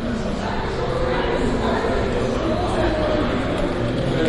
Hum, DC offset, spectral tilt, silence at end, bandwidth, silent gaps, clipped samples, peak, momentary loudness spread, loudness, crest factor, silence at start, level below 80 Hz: none; under 0.1%; -6.5 dB/octave; 0 s; 11.5 kHz; none; under 0.1%; -8 dBFS; 4 LU; -22 LUFS; 12 dB; 0 s; -30 dBFS